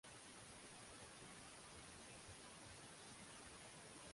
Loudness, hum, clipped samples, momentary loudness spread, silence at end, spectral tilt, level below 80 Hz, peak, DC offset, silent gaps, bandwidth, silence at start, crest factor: -58 LUFS; none; under 0.1%; 1 LU; 0 s; -2.5 dB/octave; -76 dBFS; -46 dBFS; under 0.1%; none; 11.5 kHz; 0.05 s; 14 dB